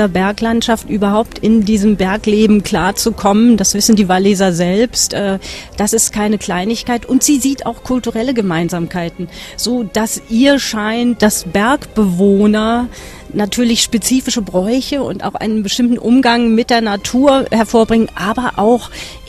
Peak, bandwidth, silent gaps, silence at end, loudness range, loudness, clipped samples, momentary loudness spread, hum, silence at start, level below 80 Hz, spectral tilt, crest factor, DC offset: 0 dBFS; 14 kHz; none; 0 s; 4 LU; -13 LUFS; under 0.1%; 8 LU; none; 0 s; -36 dBFS; -4 dB/octave; 14 dB; 0.1%